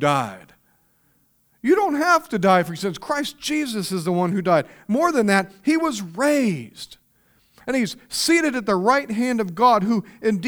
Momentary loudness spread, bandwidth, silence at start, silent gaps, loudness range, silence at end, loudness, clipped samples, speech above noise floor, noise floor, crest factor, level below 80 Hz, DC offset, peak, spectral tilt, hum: 8 LU; over 20 kHz; 0 s; none; 2 LU; 0 s; -21 LUFS; under 0.1%; 42 dB; -63 dBFS; 18 dB; -60 dBFS; under 0.1%; -4 dBFS; -5 dB/octave; none